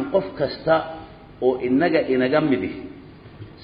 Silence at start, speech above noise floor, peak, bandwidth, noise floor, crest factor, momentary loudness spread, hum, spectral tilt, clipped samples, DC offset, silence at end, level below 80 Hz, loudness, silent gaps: 0 s; 22 dB; -6 dBFS; 5.2 kHz; -42 dBFS; 16 dB; 20 LU; none; -10.5 dB/octave; under 0.1%; under 0.1%; 0 s; -52 dBFS; -21 LUFS; none